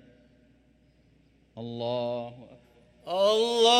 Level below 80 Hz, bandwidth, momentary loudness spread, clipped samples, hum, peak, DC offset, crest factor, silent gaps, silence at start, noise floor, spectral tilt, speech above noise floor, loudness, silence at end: -68 dBFS; 14 kHz; 25 LU; under 0.1%; none; -8 dBFS; under 0.1%; 20 dB; none; 1.55 s; -63 dBFS; -3 dB/octave; 37 dB; -28 LUFS; 0 s